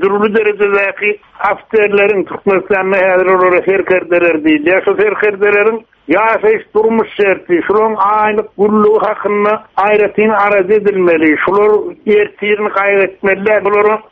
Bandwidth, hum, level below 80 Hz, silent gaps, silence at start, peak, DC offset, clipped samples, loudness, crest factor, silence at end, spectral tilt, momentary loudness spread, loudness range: 4.2 kHz; none; -50 dBFS; none; 0 s; 0 dBFS; under 0.1%; under 0.1%; -11 LUFS; 10 dB; 0.1 s; -8 dB/octave; 4 LU; 1 LU